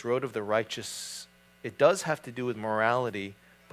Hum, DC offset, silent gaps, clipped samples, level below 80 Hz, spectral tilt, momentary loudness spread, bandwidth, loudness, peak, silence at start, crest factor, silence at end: none; under 0.1%; none; under 0.1%; -70 dBFS; -4 dB/octave; 17 LU; 16 kHz; -29 LUFS; -8 dBFS; 0 s; 22 dB; 0.4 s